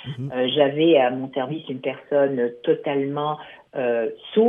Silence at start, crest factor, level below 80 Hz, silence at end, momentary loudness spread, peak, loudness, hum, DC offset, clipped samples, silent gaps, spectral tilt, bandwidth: 0 s; 18 dB; -70 dBFS; 0 s; 12 LU; -4 dBFS; -22 LUFS; none; under 0.1%; under 0.1%; none; -9 dB/octave; 3.8 kHz